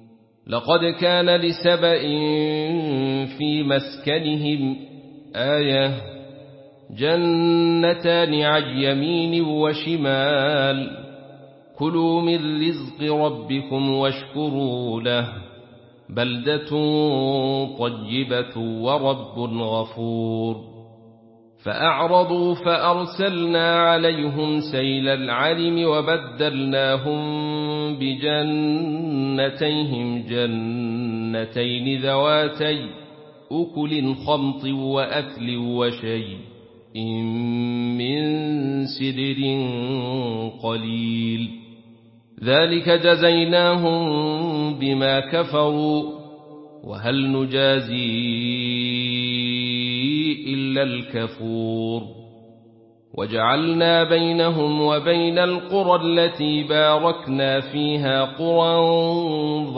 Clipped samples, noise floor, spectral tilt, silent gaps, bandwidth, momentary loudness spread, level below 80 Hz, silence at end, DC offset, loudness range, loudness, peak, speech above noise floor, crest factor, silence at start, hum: under 0.1%; -52 dBFS; -10.5 dB/octave; none; 5.8 kHz; 10 LU; -62 dBFS; 0 s; under 0.1%; 6 LU; -21 LUFS; -4 dBFS; 31 dB; 18 dB; 0.45 s; none